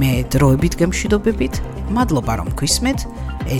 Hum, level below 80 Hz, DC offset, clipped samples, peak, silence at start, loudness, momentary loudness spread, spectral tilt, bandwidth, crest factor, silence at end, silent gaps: none; -26 dBFS; under 0.1%; under 0.1%; -2 dBFS; 0 s; -18 LUFS; 9 LU; -5 dB/octave; 17.5 kHz; 16 dB; 0 s; none